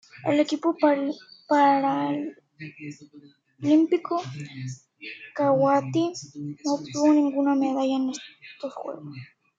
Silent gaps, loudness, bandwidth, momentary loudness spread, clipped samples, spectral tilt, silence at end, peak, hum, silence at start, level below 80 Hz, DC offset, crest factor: none; -24 LUFS; 7.8 kHz; 19 LU; under 0.1%; -6 dB/octave; 0.35 s; -8 dBFS; none; 0.15 s; -76 dBFS; under 0.1%; 18 dB